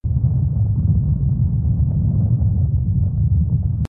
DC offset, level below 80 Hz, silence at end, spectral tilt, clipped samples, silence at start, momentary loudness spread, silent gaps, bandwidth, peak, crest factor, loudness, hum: under 0.1%; -24 dBFS; 0 s; -12.5 dB/octave; under 0.1%; 0.05 s; 1 LU; none; 1.4 kHz; -6 dBFS; 10 dB; -19 LUFS; none